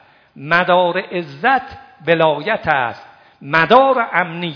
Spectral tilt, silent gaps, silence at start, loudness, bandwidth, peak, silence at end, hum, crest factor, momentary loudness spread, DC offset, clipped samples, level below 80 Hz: -7 dB/octave; none; 0.35 s; -15 LUFS; 5.4 kHz; 0 dBFS; 0 s; none; 16 dB; 13 LU; under 0.1%; 0.1%; -54 dBFS